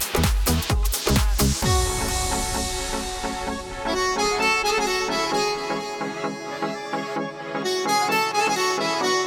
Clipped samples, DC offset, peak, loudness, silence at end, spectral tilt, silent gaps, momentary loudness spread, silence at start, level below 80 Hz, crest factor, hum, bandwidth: under 0.1%; under 0.1%; -8 dBFS; -23 LUFS; 0 s; -3.5 dB/octave; none; 9 LU; 0 s; -30 dBFS; 14 dB; none; over 20 kHz